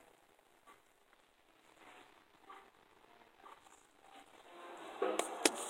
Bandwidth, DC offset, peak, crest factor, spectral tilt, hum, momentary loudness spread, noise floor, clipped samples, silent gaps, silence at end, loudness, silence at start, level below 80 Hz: 16 kHz; under 0.1%; -8 dBFS; 38 dB; -0.5 dB/octave; none; 27 LU; -70 dBFS; under 0.1%; none; 0 s; -39 LUFS; 0.65 s; -84 dBFS